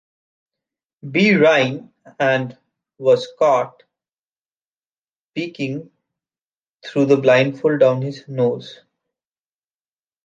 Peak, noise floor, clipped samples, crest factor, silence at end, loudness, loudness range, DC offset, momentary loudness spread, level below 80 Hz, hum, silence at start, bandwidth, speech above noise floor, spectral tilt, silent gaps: -2 dBFS; under -90 dBFS; under 0.1%; 18 dB; 1.5 s; -18 LUFS; 7 LU; under 0.1%; 18 LU; -70 dBFS; none; 1.05 s; 7.6 kHz; over 73 dB; -6.5 dB/octave; 4.19-4.24 s, 4.32-4.60 s, 4.66-4.71 s, 4.87-5.32 s, 6.72-6.80 s